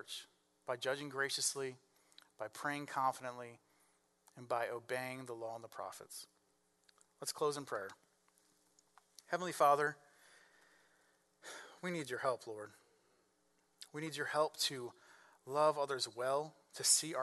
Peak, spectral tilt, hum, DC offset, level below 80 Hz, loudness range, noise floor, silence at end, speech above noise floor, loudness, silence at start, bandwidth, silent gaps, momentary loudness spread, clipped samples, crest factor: -16 dBFS; -2 dB/octave; none; under 0.1%; under -90 dBFS; 7 LU; -77 dBFS; 0 s; 38 dB; -39 LUFS; 0.05 s; 12 kHz; none; 19 LU; under 0.1%; 24 dB